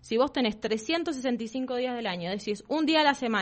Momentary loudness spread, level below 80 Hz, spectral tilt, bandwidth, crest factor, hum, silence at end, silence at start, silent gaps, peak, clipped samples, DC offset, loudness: 9 LU; -62 dBFS; -4 dB/octave; 8.4 kHz; 18 dB; none; 0 s; 0.05 s; none; -10 dBFS; under 0.1%; under 0.1%; -28 LUFS